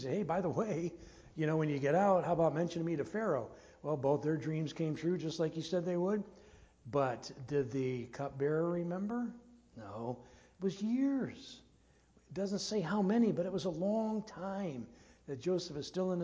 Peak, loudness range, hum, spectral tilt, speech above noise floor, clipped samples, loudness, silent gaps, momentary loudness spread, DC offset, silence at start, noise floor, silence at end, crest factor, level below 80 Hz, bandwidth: -18 dBFS; 5 LU; none; -7 dB/octave; 32 dB; under 0.1%; -36 LUFS; none; 14 LU; under 0.1%; 0 s; -67 dBFS; 0 s; 18 dB; -68 dBFS; 8 kHz